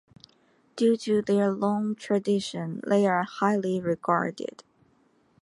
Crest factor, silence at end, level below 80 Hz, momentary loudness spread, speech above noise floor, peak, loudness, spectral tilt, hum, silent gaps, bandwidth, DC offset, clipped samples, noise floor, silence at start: 18 dB; 0.8 s; -72 dBFS; 10 LU; 39 dB; -8 dBFS; -26 LUFS; -6.5 dB/octave; none; none; 11.5 kHz; under 0.1%; under 0.1%; -65 dBFS; 0.75 s